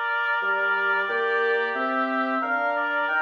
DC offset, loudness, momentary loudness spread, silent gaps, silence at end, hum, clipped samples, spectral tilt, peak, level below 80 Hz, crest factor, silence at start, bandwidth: under 0.1%; -23 LUFS; 2 LU; none; 0 s; none; under 0.1%; -4 dB/octave; -12 dBFS; -74 dBFS; 12 dB; 0 s; 7 kHz